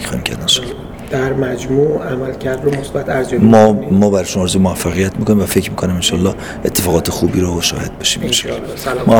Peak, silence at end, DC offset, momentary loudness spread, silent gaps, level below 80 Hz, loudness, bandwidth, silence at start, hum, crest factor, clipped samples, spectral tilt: 0 dBFS; 0 s; under 0.1%; 9 LU; none; -34 dBFS; -15 LUFS; over 20 kHz; 0 s; none; 14 dB; 0.1%; -4.5 dB/octave